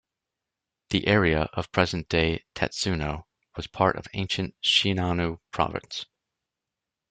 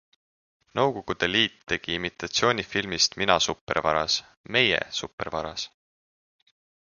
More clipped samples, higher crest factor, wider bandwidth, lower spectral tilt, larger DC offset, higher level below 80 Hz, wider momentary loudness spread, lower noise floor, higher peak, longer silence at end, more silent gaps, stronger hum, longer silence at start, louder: neither; about the same, 24 dB vs 26 dB; about the same, 9.2 kHz vs 10 kHz; first, -4.5 dB/octave vs -2.5 dB/octave; neither; first, -48 dBFS vs -54 dBFS; first, 15 LU vs 10 LU; about the same, -87 dBFS vs under -90 dBFS; about the same, -4 dBFS vs -2 dBFS; second, 1.05 s vs 1.25 s; second, none vs 3.61-3.67 s, 4.37-4.44 s, 5.13-5.18 s; neither; first, 0.9 s vs 0.75 s; about the same, -26 LUFS vs -25 LUFS